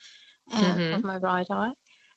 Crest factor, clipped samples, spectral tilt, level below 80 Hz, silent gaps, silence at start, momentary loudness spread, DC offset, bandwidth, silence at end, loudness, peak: 18 dB; under 0.1%; -6 dB/octave; -68 dBFS; none; 0.05 s; 8 LU; under 0.1%; 8 kHz; 0.4 s; -27 LUFS; -10 dBFS